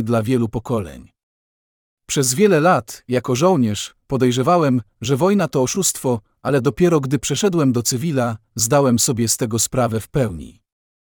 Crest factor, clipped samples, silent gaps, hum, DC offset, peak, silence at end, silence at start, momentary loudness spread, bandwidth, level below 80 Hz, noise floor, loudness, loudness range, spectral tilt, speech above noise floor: 16 dB; under 0.1%; 1.23-1.97 s; none; under 0.1%; -4 dBFS; 0.5 s; 0 s; 8 LU; over 20 kHz; -48 dBFS; under -90 dBFS; -18 LUFS; 2 LU; -5 dB/octave; over 72 dB